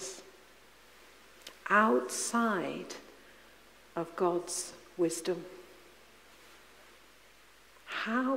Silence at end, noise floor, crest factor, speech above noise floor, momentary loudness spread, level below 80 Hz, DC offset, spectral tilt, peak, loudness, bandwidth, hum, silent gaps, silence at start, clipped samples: 0 s; -60 dBFS; 22 dB; 29 dB; 24 LU; -72 dBFS; under 0.1%; -3.5 dB/octave; -14 dBFS; -32 LUFS; 16 kHz; none; none; 0 s; under 0.1%